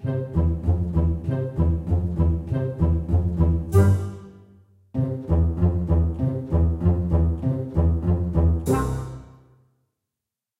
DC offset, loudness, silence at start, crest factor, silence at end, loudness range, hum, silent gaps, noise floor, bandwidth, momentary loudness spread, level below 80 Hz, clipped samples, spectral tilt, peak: under 0.1%; -23 LUFS; 0 s; 18 dB; 1.3 s; 2 LU; none; none; -86 dBFS; 12 kHz; 6 LU; -28 dBFS; under 0.1%; -9.5 dB/octave; -4 dBFS